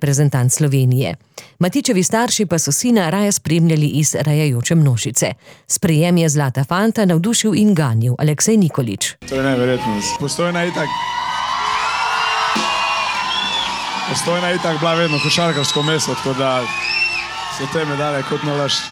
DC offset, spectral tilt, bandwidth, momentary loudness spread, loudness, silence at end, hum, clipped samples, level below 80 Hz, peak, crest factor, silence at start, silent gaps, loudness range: under 0.1%; -4.5 dB/octave; 19 kHz; 6 LU; -17 LUFS; 0 s; none; under 0.1%; -52 dBFS; -4 dBFS; 14 dB; 0 s; none; 3 LU